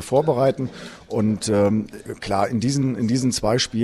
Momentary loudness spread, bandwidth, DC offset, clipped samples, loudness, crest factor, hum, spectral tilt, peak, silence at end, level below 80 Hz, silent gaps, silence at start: 11 LU; 14.5 kHz; under 0.1%; under 0.1%; -21 LUFS; 16 dB; none; -5.5 dB/octave; -6 dBFS; 0 s; -48 dBFS; none; 0 s